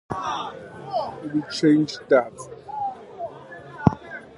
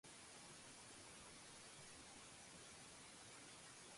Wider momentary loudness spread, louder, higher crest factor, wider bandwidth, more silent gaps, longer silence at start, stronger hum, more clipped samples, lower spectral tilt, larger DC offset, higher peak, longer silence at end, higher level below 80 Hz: first, 17 LU vs 0 LU; first, -24 LUFS vs -59 LUFS; first, 24 dB vs 14 dB; about the same, 11.5 kHz vs 11.5 kHz; neither; about the same, 0.1 s vs 0.05 s; neither; neither; first, -6.5 dB/octave vs -1.5 dB/octave; neither; first, 0 dBFS vs -48 dBFS; about the same, 0 s vs 0 s; first, -50 dBFS vs -80 dBFS